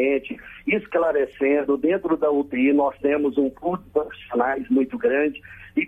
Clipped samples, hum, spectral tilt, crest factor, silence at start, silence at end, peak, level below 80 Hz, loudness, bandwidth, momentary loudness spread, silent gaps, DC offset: under 0.1%; none; -8 dB/octave; 14 dB; 0 s; 0 s; -8 dBFS; -56 dBFS; -22 LUFS; 3.8 kHz; 7 LU; none; under 0.1%